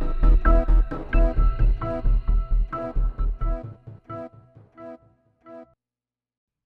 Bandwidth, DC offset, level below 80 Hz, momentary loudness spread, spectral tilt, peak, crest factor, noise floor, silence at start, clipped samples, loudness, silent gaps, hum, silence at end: 3.1 kHz; under 0.1%; -22 dBFS; 22 LU; -10 dB/octave; -6 dBFS; 16 dB; under -90 dBFS; 0 s; under 0.1%; -25 LUFS; none; none; 1.05 s